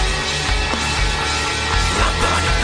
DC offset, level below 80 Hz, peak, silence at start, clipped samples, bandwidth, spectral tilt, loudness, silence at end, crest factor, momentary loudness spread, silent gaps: under 0.1%; -24 dBFS; -4 dBFS; 0 s; under 0.1%; 10.5 kHz; -3 dB/octave; -18 LUFS; 0 s; 14 dB; 2 LU; none